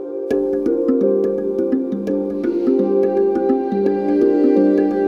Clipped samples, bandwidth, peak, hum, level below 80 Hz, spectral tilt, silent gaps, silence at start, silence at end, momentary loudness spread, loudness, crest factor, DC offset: under 0.1%; 6 kHz; -4 dBFS; none; -52 dBFS; -9.5 dB/octave; none; 0 s; 0 s; 6 LU; -17 LUFS; 12 dB; under 0.1%